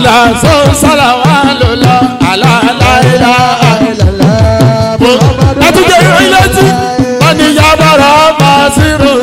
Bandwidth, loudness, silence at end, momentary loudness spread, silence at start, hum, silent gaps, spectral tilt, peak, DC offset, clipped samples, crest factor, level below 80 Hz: 16.5 kHz; -5 LUFS; 0 s; 4 LU; 0 s; none; none; -5 dB/octave; 0 dBFS; under 0.1%; 1%; 6 dB; -22 dBFS